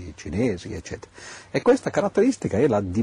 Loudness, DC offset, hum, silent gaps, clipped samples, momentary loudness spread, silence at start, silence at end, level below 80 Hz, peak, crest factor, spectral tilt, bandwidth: -23 LUFS; under 0.1%; none; none; under 0.1%; 17 LU; 0 s; 0 s; -48 dBFS; -8 dBFS; 16 dB; -6.5 dB/octave; 10.5 kHz